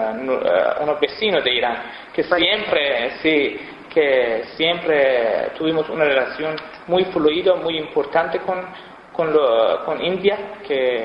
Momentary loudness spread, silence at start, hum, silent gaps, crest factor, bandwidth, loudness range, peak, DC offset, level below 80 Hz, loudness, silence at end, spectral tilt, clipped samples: 9 LU; 0 s; none; none; 16 dB; 5.6 kHz; 2 LU; -2 dBFS; under 0.1%; -56 dBFS; -19 LUFS; 0 s; -6.5 dB/octave; under 0.1%